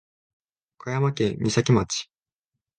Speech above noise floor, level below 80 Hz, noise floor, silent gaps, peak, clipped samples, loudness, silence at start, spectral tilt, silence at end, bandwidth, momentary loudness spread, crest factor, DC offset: 63 dB; -52 dBFS; -86 dBFS; none; -6 dBFS; under 0.1%; -24 LUFS; 0.85 s; -5.5 dB/octave; 0.75 s; 10 kHz; 14 LU; 20 dB; under 0.1%